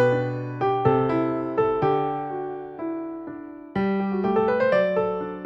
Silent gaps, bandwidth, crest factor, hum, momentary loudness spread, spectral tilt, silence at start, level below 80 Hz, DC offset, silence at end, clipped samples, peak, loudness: none; 7.2 kHz; 16 dB; none; 12 LU; -9 dB/octave; 0 s; -56 dBFS; under 0.1%; 0 s; under 0.1%; -8 dBFS; -24 LUFS